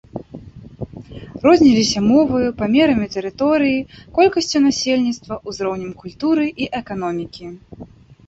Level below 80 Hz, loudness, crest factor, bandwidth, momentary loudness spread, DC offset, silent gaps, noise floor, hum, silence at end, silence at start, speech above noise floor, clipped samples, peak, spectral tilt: -46 dBFS; -17 LUFS; 16 dB; 8 kHz; 20 LU; under 0.1%; none; -37 dBFS; none; 0.4 s; 0.15 s; 20 dB; under 0.1%; -2 dBFS; -5 dB/octave